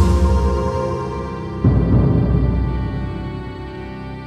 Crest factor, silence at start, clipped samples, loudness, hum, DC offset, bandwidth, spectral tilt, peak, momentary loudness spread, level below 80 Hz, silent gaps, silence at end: 16 dB; 0 s; under 0.1%; -19 LUFS; none; under 0.1%; 9.4 kHz; -8.5 dB/octave; -2 dBFS; 15 LU; -22 dBFS; none; 0 s